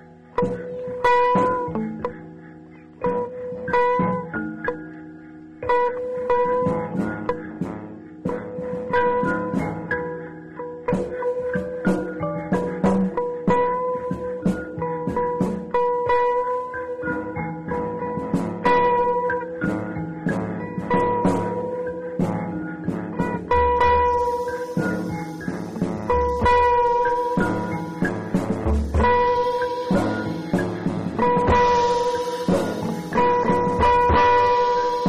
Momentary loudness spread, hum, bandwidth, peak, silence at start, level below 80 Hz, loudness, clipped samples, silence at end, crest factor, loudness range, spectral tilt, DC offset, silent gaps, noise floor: 12 LU; none; 12 kHz; -8 dBFS; 0 s; -38 dBFS; -22 LUFS; under 0.1%; 0 s; 14 dB; 5 LU; -7 dB/octave; 0.2%; none; -43 dBFS